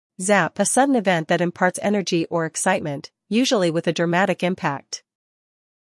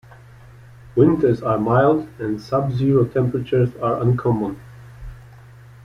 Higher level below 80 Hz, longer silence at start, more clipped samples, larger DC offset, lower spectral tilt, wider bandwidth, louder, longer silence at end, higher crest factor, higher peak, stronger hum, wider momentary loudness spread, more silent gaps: second, -70 dBFS vs -46 dBFS; second, 0.2 s vs 0.85 s; neither; neither; second, -4 dB/octave vs -9.5 dB/octave; first, 12 kHz vs 6.6 kHz; about the same, -21 LUFS vs -19 LUFS; first, 0.9 s vs 0.65 s; about the same, 18 dB vs 18 dB; about the same, -4 dBFS vs -2 dBFS; neither; second, 8 LU vs 19 LU; neither